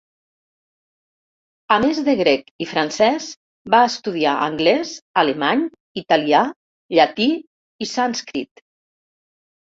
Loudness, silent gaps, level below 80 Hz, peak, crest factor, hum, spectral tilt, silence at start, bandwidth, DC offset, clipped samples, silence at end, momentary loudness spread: -19 LUFS; 2.51-2.59 s, 3.37-3.65 s, 5.02-5.14 s, 5.80-5.95 s, 6.56-6.89 s, 7.47-7.79 s; -60 dBFS; -2 dBFS; 18 dB; none; -4 dB/octave; 1.7 s; 7.8 kHz; under 0.1%; under 0.1%; 1.2 s; 12 LU